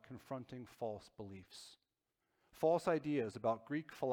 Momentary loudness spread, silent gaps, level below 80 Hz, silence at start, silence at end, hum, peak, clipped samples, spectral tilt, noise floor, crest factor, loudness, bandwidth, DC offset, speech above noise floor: 18 LU; none; -78 dBFS; 0.1 s; 0 s; none; -22 dBFS; under 0.1%; -6.5 dB/octave; -88 dBFS; 18 dB; -40 LUFS; 18 kHz; under 0.1%; 48 dB